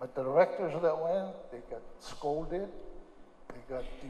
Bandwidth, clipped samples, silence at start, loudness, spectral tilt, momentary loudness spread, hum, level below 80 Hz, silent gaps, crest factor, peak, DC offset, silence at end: 10.5 kHz; under 0.1%; 0 s; -33 LUFS; -6.5 dB/octave; 23 LU; none; -52 dBFS; none; 20 dB; -14 dBFS; under 0.1%; 0 s